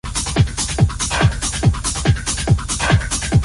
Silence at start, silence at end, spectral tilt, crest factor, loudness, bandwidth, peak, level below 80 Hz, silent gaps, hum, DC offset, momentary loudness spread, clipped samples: 0.05 s; 0 s; -4 dB/octave; 16 dB; -18 LUFS; 11.5 kHz; -2 dBFS; -24 dBFS; none; none; under 0.1%; 2 LU; under 0.1%